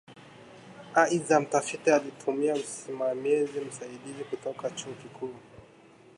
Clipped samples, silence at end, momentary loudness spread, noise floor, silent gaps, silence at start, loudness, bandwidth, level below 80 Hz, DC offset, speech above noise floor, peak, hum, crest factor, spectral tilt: under 0.1%; 0.5 s; 17 LU; -55 dBFS; none; 0.1 s; -29 LUFS; 11.5 kHz; -74 dBFS; under 0.1%; 27 dB; -8 dBFS; none; 22 dB; -4 dB/octave